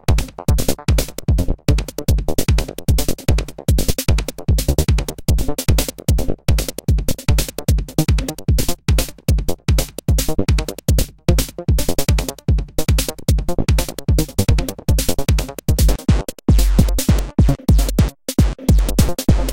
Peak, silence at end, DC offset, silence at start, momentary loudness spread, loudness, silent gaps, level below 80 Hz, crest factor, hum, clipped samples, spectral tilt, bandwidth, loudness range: 0 dBFS; 0 s; under 0.1%; 0.1 s; 4 LU; -19 LUFS; none; -20 dBFS; 16 dB; none; under 0.1%; -5.5 dB/octave; 17 kHz; 3 LU